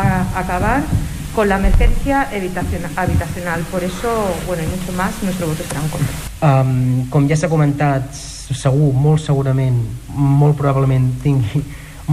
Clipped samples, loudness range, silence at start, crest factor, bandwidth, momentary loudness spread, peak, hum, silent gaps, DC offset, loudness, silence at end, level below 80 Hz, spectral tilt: under 0.1%; 4 LU; 0 s; 14 dB; 15.5 kHz; 8 LU; -2 dBFS; none; none; under 0.1%; -17 LUFS; 0 s; -24 dBFS; -7 dB/octave